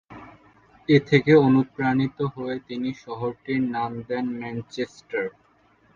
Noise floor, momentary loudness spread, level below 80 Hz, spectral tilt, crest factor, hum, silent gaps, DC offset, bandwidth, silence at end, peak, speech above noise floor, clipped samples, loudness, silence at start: -60 dBFS; 15 LU; -60 dBFS; -8 dB/octave; 20 dB; none; none; under 0.1%; 7.4 kHz; 0.65 s; -4 dBFS; 37 dB; under 0.1%; -24 LUFS; 0.1 s